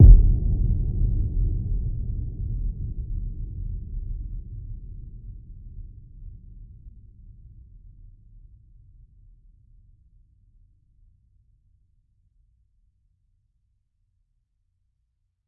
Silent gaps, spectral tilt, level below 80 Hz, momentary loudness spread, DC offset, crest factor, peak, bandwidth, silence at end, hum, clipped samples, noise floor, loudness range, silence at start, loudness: none; -14.5 dB/octave; -26 dBFS; 23 LU; under 0.1%; 24 dB; -2 dBFS; 0.9 kHz; 8.6 s; none; under 0.1%; -73 dBFS; 25 LU; 0 s; -27 LUFS